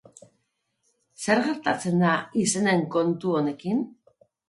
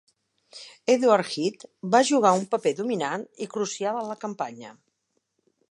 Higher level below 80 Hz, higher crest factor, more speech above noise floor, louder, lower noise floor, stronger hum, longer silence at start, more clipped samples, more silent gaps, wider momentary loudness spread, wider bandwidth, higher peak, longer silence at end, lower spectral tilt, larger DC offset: first, -68 dBFS vs -80 dBFS; about the same, 20 dB vs 22 dB; about the same, 51 dB vs 52 dB; about the same, -24 LUFS vs -25 LUFS; about the same, -75 dBFS vs -76 dBFS; neither; first, 1.2 s vs 0.55 s; neither; neither; second, 6 LU vs 14 LU; about the same, 11.5 kHz vs 11.5 kHz; about the same, -6 dBFS vs -4 dBFS; second, 0.6 s vs 1 s; about the same, -5 dB/octave vs -4 dB/octave; neither